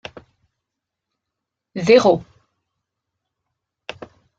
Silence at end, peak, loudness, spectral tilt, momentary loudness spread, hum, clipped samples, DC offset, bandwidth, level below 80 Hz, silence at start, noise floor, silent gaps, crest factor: 2.15 s; -2 dBFS; -16 LUFS; -5.5 dB/octave; 24 LU; none; under 0.1%; under 0.1%; 7.8 kHz; -62 dBFS; 1.75 s; -82 dBFS; none; 22 dB